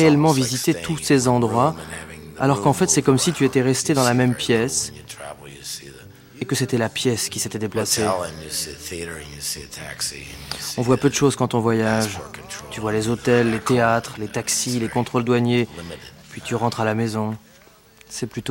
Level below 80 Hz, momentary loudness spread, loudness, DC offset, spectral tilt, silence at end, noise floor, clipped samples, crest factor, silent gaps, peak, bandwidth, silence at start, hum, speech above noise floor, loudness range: -50 dBFS; 16 LU; -21 LUFS; under 0.1%; -4.5 dB/octave; 0 s; -50 dBFS; under 0.1%; 18 dB; none; -4 dBFS; 16.5 kHz; 0 s; none; 30 dB; 6 LU